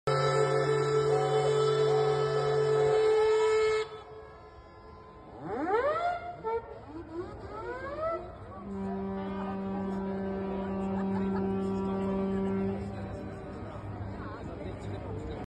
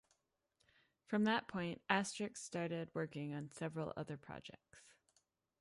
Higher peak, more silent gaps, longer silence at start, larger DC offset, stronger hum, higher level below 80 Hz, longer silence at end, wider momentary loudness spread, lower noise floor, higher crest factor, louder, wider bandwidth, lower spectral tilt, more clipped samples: first, -14 dBFS vs -18 dBFS; neither; second, 0.05 s vs 1.1 s; neither; neither; first, -52 dBFS vs -78 dBFS; second, 0.05 s vs 0.7 s; first, 18 LU vs 14 LU; second, -50 dBFS vs -83 dBFS; second, 16 dB vs 24 dB; first, -31 LUFS vs -42 LUFS; second, 9.6 kHz vs 11.5 kHz; first, -6.5 dB/octave vs -5 dB/octave; neither